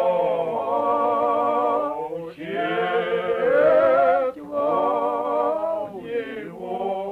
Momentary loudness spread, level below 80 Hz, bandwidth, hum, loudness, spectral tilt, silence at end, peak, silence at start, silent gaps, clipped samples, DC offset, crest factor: 12 LU; -62 dBFS; 4.9 kHz; none; -22 LUFS; -6.5 dB/octave; 0 s; -8 dBFS; 0 s; none; under 0.1%; under 0.1%; 12 dB